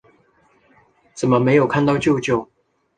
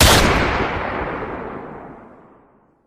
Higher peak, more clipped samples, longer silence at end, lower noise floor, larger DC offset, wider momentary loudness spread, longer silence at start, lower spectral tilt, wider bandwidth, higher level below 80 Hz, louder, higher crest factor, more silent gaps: second, -4 dBFS vs 0 dBFS; neither; second, 0.55 s vs 0.8 s; first, -58 dBFS vs -54 dBFS; neither; second, 8 LU vs 22 LU; first, 1.15 s vs 0 s; first, -6.5 dB/octave vs -3.5 dB/octave; second, 9.4 kHz vs 16.5 kHz; second, -52 dBFS vs -28 dBFS; about the same, -18 LUFS vs -19 LUFS; about the same, 18 dB vs 20 dB; neither